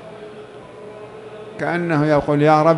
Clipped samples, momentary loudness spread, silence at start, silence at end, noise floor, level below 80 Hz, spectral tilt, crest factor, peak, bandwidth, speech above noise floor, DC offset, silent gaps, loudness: under 0.1%; 23 LU; 0 s; 0 s; -38 dBFS; -52 dBFS; -8 dB/octave; 18 dB; -2 dBFS; 11.5 kHz; 22 dB; under 0.1%; none; -17 LUFS